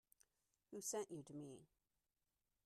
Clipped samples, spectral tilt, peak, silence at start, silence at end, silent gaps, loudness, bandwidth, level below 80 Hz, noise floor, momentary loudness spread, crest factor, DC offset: under 0.1%; -4 dB/octave; -36 dBFS; 0.7 s; 1 s; none; -51 LUFS; 13 kHz; under -90 dBFS; under -90 dBFS; 12 LU; 20 dB; under 0.1%